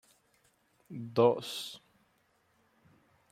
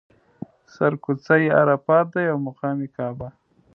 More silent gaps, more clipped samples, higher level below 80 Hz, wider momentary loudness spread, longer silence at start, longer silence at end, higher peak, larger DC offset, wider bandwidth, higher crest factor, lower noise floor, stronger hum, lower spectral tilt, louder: neither; neither; second, -80 dBFS vs -62 dBFS; about the same, 21 LU vs 23 LU; about the same, 0.9 s vs 0.8 s; first, 1.55 s vs 0.45 s; second, -12 dBFS vs -4 dBFS; neither; first, 16 kHz vs 6.4 kHz; about the same, 24 dB vs 20 dB; first, -72 dBFS vs -41 dBFS; neither; second, -5.5 dB/octave vs -9 dB/octave; second, -31 LUFS vs -21 LUFS